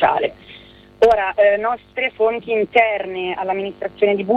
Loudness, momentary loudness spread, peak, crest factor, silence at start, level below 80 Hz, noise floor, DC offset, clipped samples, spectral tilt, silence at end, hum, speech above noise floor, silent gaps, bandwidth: -18 LUFS; 9 LU; -2 dBFS; 16 dB; 0 s; -52 dBFS; -43 dBFS; under 0.1%; under 0.1%; -6 dB/octave; 0 s; none; 25 dB; none; 7.4 kHz